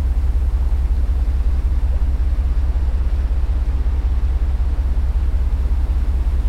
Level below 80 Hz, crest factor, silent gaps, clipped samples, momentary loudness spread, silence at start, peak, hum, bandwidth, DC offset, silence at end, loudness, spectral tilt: -16 dBFS; 10 dB; none; under 0.1%; 1 LU; 0 s; -8 dBFS; none; 4.8 kHz; under 0.1%; 0 s; -21 LUFS; -8 dB/octave